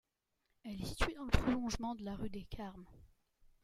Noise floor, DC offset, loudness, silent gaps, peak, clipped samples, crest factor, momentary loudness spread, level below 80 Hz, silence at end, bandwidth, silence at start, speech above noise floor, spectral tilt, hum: -84 dBFS; under 0.1%; -40 LUFS; none; -12 dBFS; under 0.1%; 28 dB; 15 LU; -46 dBFS; 0.6 s; 15.5 kHz; 0.65 s; 45 dB; -5.5 dB/octave; none